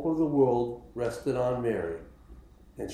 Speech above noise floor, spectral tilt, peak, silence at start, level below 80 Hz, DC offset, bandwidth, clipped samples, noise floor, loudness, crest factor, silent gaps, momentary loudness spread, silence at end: 23 dB; -7.5 dB/octave; -12 dBFS; 0 s; -52 dBFS; under 0.1%; 13.5 kHz; under 0.1%; -51 dBFS; -29 LUFS; 18 dB; none; 12 LU; 0 s